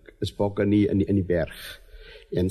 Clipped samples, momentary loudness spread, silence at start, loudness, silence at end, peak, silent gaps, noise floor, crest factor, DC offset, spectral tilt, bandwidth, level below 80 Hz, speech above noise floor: under 0.1%; 18 LU; 0.2 s; -25 LUFS; 0 s; -10 dBFS; none; -45 dBFS; 14 dB; under 0.1%; -8 dB/octave; 13.5 kHz; -46 dBFS; 21 dB